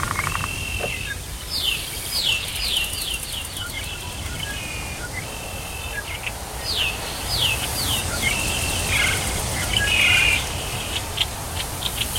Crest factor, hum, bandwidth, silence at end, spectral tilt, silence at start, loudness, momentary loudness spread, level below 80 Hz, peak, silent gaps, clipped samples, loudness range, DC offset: 20 dB; none; 16.5 kHz; 0 s; -1.5 dB/octave; 0 s; -22 LUFS; 11 LU; -36 dBFS; -4 dBFS; none; under 0.1%; 9 LU; under 0.1%